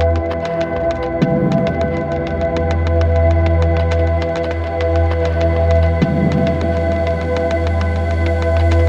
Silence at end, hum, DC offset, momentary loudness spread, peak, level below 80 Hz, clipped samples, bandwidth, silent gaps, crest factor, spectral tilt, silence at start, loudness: 0 s; none; under 0.1%; 5 LU; -2 dBFS; -22 dBFS; under 0.1%; 7.2 kHz; none; 14 dB; -8 dB/octave; 0 s; -16 LUFS